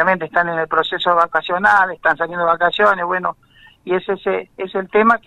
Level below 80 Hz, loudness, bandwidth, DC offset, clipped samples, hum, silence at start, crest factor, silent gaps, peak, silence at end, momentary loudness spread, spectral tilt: -54 dBFS; -17 LUFS; 10.5 kHz; under 0.1%; under 0.1%; none; 0 s; 16 dB; none; 0 dBFS; 0.1 s; 9 LU; -5.5 dB/octave